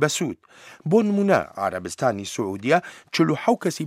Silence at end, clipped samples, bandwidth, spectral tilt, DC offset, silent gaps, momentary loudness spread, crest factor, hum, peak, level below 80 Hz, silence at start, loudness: 0 s; under 0.1%; 16 kHz; -5 dB/octave; under 0.1%; none; 9 LU; 18 dB; none; -6 dBFS; -64 dBFS; 0 s; -23 LUFS